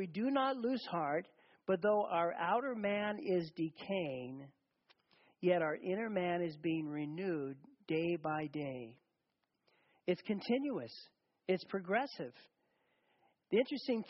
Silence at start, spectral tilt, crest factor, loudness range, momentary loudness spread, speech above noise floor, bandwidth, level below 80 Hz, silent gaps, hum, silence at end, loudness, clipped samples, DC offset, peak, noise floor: 0 s; -4.5 dB/octave; 18 dB; 5 LU; 13 LU; 48 dB; 5.8 kHz; -82 dBFS; none; none; 0 s; -38 LUFS; under 0.1%; under 0.1%; -20 dBFS; -85 dBFS